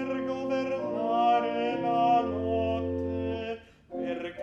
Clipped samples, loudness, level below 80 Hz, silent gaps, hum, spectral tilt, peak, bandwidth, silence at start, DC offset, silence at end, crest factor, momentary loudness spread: under 0.1%; -29 LUFS; -56 dBFS; none; none; -7.5 dB/octave; -14 dBFS; 7.2 kHz; 0 s; under 0.1%; 0 s; 14 dB; 11 LU